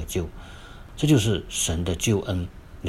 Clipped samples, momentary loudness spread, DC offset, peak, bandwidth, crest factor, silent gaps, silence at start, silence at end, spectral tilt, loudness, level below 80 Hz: under 0.1%; 22 LU; under 0.1%; -6 dBFS; 16 kHz; 18 dB; none; 0 s; 0 s; -5 dB/octave; -24 LUFS; -42 dBFS